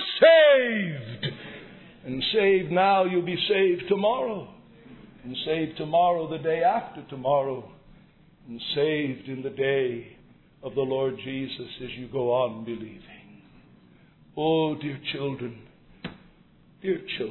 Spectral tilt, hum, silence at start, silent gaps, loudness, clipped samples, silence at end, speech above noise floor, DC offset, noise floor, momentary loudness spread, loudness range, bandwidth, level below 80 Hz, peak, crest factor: -8.5 dB/octave; none; 0 s; none; -25 LUFS; under 0.1%; 0 s; 32 dB; under 0.1%; -57 dBFS; 18 LU; 7 LU; 4.3 kHz; -60 dBFS; -6 dBFS; 20 dB